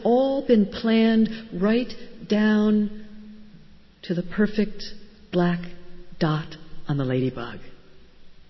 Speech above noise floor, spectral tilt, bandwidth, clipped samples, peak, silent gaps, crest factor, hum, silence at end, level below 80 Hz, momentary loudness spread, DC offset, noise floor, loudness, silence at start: 25 dB; -8 dB/octave; 6 kHz; under 0.1%; -6 dBFS; none; 18 dB; none; 0.05 s; -50 dBFS; 20 LU; under 0.1%; -48 dBFS; -23 LUFS; 0 s